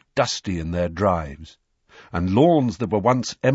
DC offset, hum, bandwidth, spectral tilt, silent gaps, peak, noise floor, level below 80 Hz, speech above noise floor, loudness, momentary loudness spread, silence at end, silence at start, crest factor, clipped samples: under 0.1%; none; 8 kHz; -6 dB/octave; none; -4 dBFS; -51 dBFS; -44 dBFS; 31 dB; -21 LUFS; 11 LU; 0 s; 0.15 s; 18 dB; under 0.1%